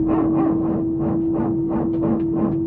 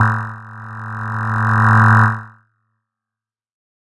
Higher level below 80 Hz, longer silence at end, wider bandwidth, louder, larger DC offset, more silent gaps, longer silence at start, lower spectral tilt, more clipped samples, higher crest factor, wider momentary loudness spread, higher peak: first, -42 dBFS vs -48 dBFS; second, 0 s vs 1.55 s; second, 3 kHz vs 8 kHz; second, -21 LUFS vs -15 LUFS; neither; neither; about the same, 0 s vs 0 s; first, -13 dB/octave vs -8 dB/octave; neither; about the same, 12 dB vs 16 dB; second, 3 LU vs 20 LU; second, -8 dBFS vs 0 dBFS